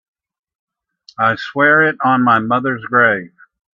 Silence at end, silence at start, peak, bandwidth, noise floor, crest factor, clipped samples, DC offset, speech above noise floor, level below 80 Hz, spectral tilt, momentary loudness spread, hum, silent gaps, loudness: 0.45 s; 1.2 s; 0 dBFS; 7.2 kHz; -49 dBFS; 16 dB; under 0.1%; under 0.1%; 35 dB; -62 dBFS; -7.5 dB/octave; 6 LU; none; none; -14 LUFS